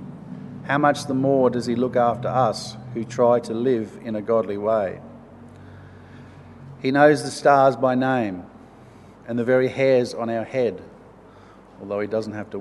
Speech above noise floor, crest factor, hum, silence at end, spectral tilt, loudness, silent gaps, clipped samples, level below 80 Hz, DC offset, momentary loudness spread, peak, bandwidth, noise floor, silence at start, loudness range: 26 dB; 22 dB; none; 0 s; -6 dB/octave; -21 LUFS; none; under 0.1%; -60 dBFS; under 0.1%; 15 LU; -2 dBFS; 12 kHz; -47 dBFS; 0 s; 4 LU